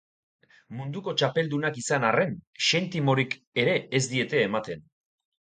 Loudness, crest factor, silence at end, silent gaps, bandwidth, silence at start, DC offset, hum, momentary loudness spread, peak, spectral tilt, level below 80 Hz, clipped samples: -26 LUFS; 20 dB; 0.8 s; 2.47-2.53 s, 3.47-3.52 s; 9.6 kHz; 0.7 s; under 0.1%; none; 11 LU; -6 dBFS; -4.5 dB/octave; -68 dBFS; under 0.1%